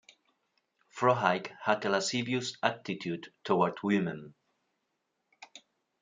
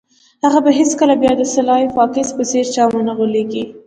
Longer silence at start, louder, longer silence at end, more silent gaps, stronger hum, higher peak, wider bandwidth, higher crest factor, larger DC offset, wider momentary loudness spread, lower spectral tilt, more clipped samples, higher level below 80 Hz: first, 0.95 s vs 0.45 s; second, -31 LUFS vs -15 LUFS; first, 0.45 s vs 0.1 s; neither; neither; second, -8 dBFS vs 0 dBFS; about the same, 9.6 kHz vs 9.6 kHz; first, 24 dB vs 14 dB; neither; first, 18 LU vs 6 LU; about the same, -4.5 dB/octave vs -4 dB/octave; neither; second, -78 dBFS vs -52 dBFS